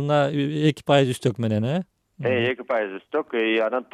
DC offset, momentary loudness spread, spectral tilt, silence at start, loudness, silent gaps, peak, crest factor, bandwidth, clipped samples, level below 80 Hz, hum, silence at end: under 0.1%; 8 LU; -6.5 dB/octave; 0 s; -23 LUFS; none; -4 dBFS; 18 dB; 13.5 kHz; under 0.1%; -64 dBFS; none; 0.1 s